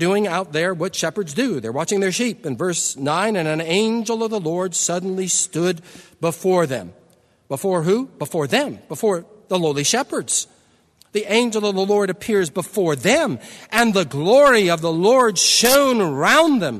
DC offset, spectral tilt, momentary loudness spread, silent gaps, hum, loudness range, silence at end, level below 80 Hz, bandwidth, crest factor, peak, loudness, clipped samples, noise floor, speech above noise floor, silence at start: under 0.1%; -3.5 dB/octave; 11 LU; none; none; 7 LU; 0 s; -58 dBFS; 13.5 kHz; 20 dB; 0 dBFS; -19 LUFS; under 0.1%; -56 dBFS; 37 dB; 0 s